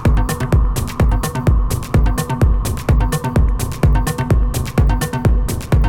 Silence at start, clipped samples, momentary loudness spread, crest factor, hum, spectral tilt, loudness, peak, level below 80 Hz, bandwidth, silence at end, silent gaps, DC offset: 0 s; under 0.1%; 2 LU; 12 dB; none; -6.5 dB/octave; -17 LUFS; -2 dBFS; -16 dBFS; 17 kHz; 0 s; none; under 0.1%